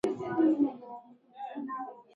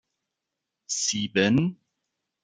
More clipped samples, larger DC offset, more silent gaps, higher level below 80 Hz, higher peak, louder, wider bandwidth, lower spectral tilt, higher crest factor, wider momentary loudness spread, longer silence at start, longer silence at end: neither; neither; neither; second, -74 dBFS vs -64 dBFS; second, -16 dBFS vs -6 dBFS; second, -31 LUFS vs -25 LUFS; first, 11 kHz vs 9.8 kHz; first, -7.5 dB/octave vs -4 dB/octave; second, 16 dB vs 22 dB; first, 20 LU vs 9 LU; second, 0.05 s vs 0.9 s; second, 0.15 s vs 0.7 s